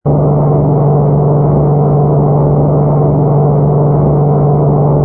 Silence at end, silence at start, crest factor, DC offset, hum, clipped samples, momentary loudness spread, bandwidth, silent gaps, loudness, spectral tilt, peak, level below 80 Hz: 0 s; 0.05 s; 8 dB; under 0.1%; none; under 0.1%; 0 LU; 2 kHz; none; -10 LUFS; -15 dB/octave; 0 dBFS; -28 dBFS